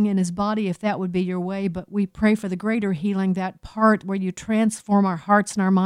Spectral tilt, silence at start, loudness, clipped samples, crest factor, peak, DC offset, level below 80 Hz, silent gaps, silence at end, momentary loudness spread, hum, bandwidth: -6.5 dB/octave; 0 s; -22 LUFS; under 0.1%; 16 dB; -6 dBFS; under 0.1%; -54 dBFS; none; 0 s; 7 LU; none; 11.5 kHz